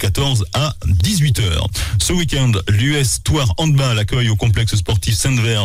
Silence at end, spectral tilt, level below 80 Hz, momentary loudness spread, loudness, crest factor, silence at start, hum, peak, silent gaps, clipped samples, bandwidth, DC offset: 0 s; -4.5 dB/octave; -28 dBFS; 3 LU; -16 LUFS; 10 dB; 0 s; none; -6 dBFS; none; under 0.1%; 16 kHz; under 0.1%